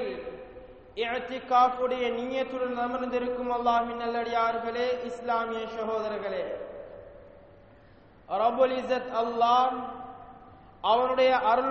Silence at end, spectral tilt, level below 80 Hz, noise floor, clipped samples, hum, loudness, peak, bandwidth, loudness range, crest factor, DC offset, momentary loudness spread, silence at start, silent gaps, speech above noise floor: 0 s; -1.5 dB/octave; -60 dBFS; -55 dBFS; under 0.1%; none; -28 LUFS; -10 dBFS; 7 kHz; 6 LU; 18 dB; under 0.1%; 19 LU; 0 s; none; 28 dB